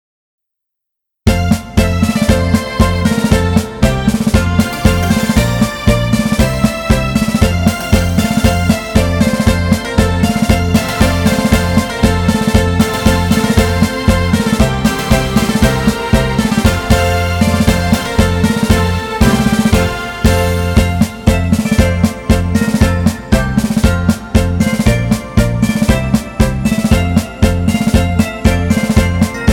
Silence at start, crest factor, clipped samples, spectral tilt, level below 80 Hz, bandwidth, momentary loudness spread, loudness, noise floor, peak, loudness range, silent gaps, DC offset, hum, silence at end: 1.25 s; 12 dB; 0.4%; -6 dB/octave; -20 dBFS; 18.5 kHz; 3 LU; -13 LUFS; -78 dBFS; 0 dBFS; 1 LU; none; 0.2%; none; 0 s